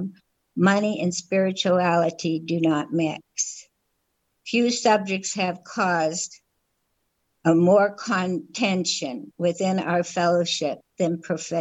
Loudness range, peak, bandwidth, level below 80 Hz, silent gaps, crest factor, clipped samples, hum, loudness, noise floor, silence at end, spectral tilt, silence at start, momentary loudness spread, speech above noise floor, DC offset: 2 LU; -6 dBFS; 8.8 kHz; -72 dBFS; none; 18 dB; under 0.1%; none; -23 LUFS; -74 dBFS; 0 s; -4.5 dB/octave; 0 s; 8 LU; 51 dB; under 0.1%